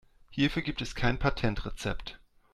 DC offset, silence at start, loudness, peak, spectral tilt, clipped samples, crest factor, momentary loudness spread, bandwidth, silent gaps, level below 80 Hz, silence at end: under 0.1%; 0.3 s; -32 LUFS; -10 dBFS; -5.5 dB/octave; under 0.1%; 22 dB; 12 LU; 13 kHz; none; -40 dBFS; 0.35 s